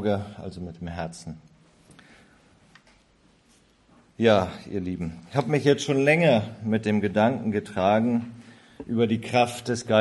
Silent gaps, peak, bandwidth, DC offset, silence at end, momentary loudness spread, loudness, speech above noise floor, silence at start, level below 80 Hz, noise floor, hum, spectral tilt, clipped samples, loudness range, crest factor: none; -4 dBFS; 12 kHz; under 0.1%; 0 s; 16 LU; -24 LUFS; 37 dB; 0 s; -52 dBFS; -61 dBFS; none; -6 dB/octave; under 0.1%; 17 LU; 20 dB